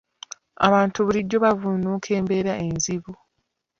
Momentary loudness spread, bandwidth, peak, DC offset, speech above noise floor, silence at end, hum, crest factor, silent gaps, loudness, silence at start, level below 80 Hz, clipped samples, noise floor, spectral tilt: 20 LU; 7.6 kHz; -2 dBFS; under 0.1%; 54 dB; 0.65 s; none; 22 dB; none; -22 LUFS; 0.6 s; -54 dBFS; under 0.1%; -76 dBFS; -5 dB/octave